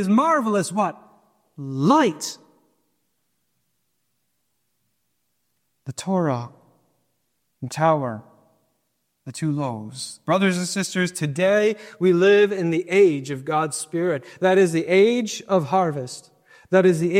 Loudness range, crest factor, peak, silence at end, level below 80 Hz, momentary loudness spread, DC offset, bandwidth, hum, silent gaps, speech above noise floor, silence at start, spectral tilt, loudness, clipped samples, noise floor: 11 LU; 18 dB; -4 dBFS; 0 s; -70 dBFS; 15 LU; under 0.1%; 15 kHz; none; none; 54 dB; 0 s; -5.5 dB/octave; -21 LUFS; under 0.1%; -74 dBFS